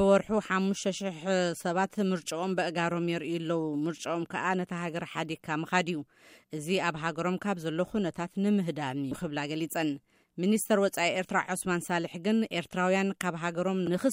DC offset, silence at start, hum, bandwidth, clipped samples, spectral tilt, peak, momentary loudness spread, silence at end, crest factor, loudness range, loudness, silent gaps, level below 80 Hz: under 0.1%; 0 s; none; 16 kHz; under 0.1%; -5 dB/octave; -10 dBFS; 7 LU; 0 s; 20 dB; 3 LU; -30 LUFS; none; -66 dBFS